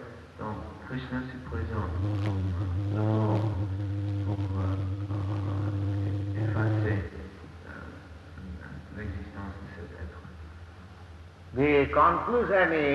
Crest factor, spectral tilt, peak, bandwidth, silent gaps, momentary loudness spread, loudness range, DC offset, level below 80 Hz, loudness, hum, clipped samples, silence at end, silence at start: 20 dB; -8.5 dB/octave; -10 dBFS; 6.4 kHz; none; 22 LU; 13 LU; under 0.1%; -48 dBFS; -29 LUFS; none; under 0.1%; 0 s; 0 s